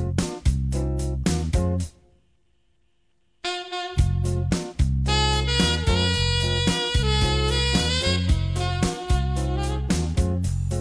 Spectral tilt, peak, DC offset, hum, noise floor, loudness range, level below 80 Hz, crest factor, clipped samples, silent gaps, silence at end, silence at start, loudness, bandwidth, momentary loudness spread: -5 dB/octave; -6 dBFS; under 0.1%; none; -70 dBFS; 7 LU; -28 dBFS; 16 dB; under 0.1%; none; 0 s; 0 s; -23 LUFS; 11 kHz; 6 LU